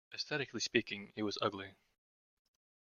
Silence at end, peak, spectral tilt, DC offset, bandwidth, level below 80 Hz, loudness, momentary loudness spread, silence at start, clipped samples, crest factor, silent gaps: 1.25 s; -14 dBFS; -3.5 dB/octave; under 0.1%; 7.4 kHz; -78 dBFS; -38 LUFS; 11 LU; 0.1 s; under 0.1%; 28 dB; none